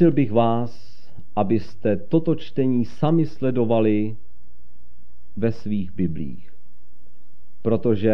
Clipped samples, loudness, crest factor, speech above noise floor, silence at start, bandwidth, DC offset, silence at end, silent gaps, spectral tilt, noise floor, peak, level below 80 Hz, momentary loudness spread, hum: under 0.1%; -23 LUFS; 18 dB; 36 dB; 0 s; 6.2 kHz; 6%; 0 s; none; -10 dB/octave; -57 dBFS; -6 dBFS; -52 dBFS; 11 LU; none